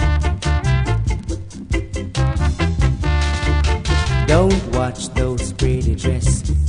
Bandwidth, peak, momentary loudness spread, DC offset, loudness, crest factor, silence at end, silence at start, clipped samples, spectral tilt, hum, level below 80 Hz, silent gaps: 10.5 kHz; -2 dBFS; 8 LU; under 0.1%; -19 LUFS; 16 dB; 0 s; 0 s; under 0.1%; -6 dB/octave; none; -20 dBFS; none